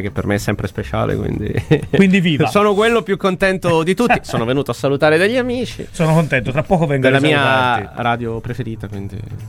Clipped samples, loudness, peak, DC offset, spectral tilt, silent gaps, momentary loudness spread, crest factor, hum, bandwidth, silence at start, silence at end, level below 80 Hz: under 0.1%; -16 LUFS; 0 dBFS; under 0.1%; -6 dB/octave; none; 11 LU; 16 dB; none; 16 kHz; 0 s; 0 s; -38 dBFS